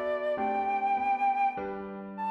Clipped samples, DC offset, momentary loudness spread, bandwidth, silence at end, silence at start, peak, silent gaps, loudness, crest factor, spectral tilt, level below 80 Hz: under 0.1%; under 0.1%; 10 LU; 5.8 kHz; 0 s; 0 s; -20 dBFS; none; -30 LUFS; 10 dB; -7 dB/octave; -66 dBFS